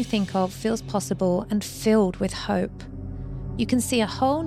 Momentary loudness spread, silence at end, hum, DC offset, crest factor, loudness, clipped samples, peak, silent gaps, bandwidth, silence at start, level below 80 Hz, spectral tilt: 13 LU; 0 s; none; under 0.1%; 14 dB; -25 LUFS; under 0.1%; -10 dBFS; none; 15.5 kHz; 0 s; -42 dBFS; -5.5 dB/octave